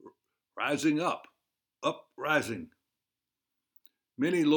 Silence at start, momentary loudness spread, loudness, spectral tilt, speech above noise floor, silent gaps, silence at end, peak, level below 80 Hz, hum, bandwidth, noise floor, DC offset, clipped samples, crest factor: 0.05 s; 13 LU; -31 LUFS; -5 dB/octave; 61 dB; none; 0 s; -12 dBFS; -78 dBFS; none; 19.5 kHz; -89 dBFS; under 0.1%; under 0.1%; 20 dB